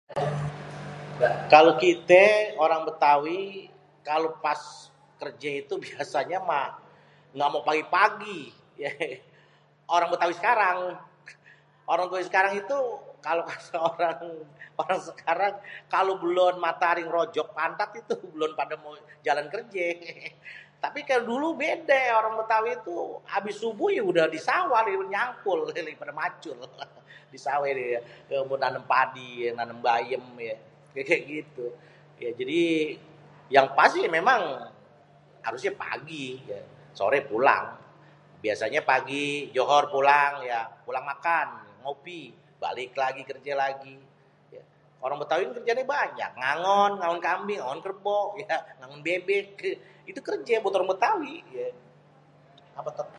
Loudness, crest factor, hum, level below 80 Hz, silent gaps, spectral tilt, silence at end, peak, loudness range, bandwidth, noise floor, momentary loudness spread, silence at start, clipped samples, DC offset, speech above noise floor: -26 LUFS; 26 dB; none; -72 dBFS; none; -4.5 dB/octave; 0 s; -2 dBFS; 6 LU; 11 kHz; -60 dBFS; 17 LU; 0.1 s; under 0.1%; under 0.1%; 33 dB